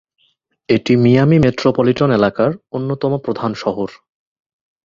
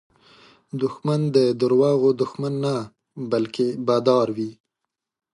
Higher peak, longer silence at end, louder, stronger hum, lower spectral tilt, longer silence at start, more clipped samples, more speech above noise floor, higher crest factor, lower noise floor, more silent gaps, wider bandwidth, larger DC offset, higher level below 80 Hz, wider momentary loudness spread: about the same, -2 dBFS vs -4 dBFS; first, 0.95 s vs 0.8 s; first, -15 LUFS vs -22 LUFS; neither; about the same, -8 dB/octave vs -7.5 dB/octave; about the same, 0.7 s vs 0.75 s; neither; second, 48 dB vs 62 dB; about the same, 16 dB vs 20 dB; second, -62 dBFS vs -83 dBFS; neither; second, 7.4 kHz vs 11 kHz; neither; first, -46 dBFS vs -68 dBFS; about the same, 11 LU vs 12 LU